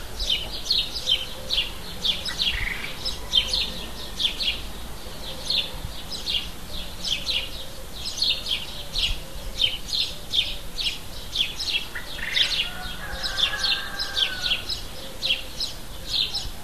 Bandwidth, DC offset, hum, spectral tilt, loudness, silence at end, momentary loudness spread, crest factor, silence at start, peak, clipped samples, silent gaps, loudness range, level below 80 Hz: 14 kHz; 1%; none; -1.5 dB/octave; -25 LUFS; 0 s; 12 LU; 22 dB; 0 s; -6 dBFS; under 0.1%; none; 3 LU; -38 dBFS